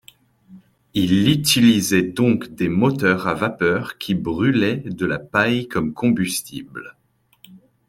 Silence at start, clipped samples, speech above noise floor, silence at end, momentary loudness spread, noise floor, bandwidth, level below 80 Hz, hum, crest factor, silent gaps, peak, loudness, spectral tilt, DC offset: 0.5 s; under 0.1%; 34 dB; 0.3 s; 10 LU; -53 dBFS; 16.5 kHz; -52 dBFS; none; 18 dB; none; -2 dBFS; -19 LUFS; -5 dB/octave; under 0.1%